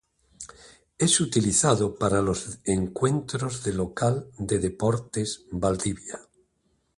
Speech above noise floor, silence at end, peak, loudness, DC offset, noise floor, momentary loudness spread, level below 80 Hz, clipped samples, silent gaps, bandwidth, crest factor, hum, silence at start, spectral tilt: 45 dB; 0.75 s; -6 dBFS; -25 LUFS; under 0.1%; -71 dBFS; 16 LU; -48 dBFS; under 0.1%; none; 11.5 kHz; 22 dB; none; 0.4 s; -4.5 dB/octave